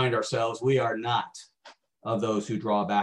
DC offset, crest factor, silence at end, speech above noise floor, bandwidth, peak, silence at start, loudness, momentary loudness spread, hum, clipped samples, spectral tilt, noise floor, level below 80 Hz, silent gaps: under 0.1%; 16 dB; 0 s; 28 dB; 11 kHz; -12 dBFS; 0 s; -27 LUFS; 12 LU; none; under 0.1%; -5.5 dB/octave; -55 dBFS; -70 dBFS; none